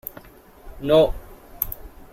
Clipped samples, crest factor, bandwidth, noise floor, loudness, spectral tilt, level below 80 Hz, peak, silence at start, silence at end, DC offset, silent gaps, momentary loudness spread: under 0.1%; 20 dB; 16.5 kHz; -46 dBFS; -22 LUFS; -6 dB/octave; -38 dBFS; -4 dBFS; 0.65 s; 0.1 s; under 0.1%; none; 20 LU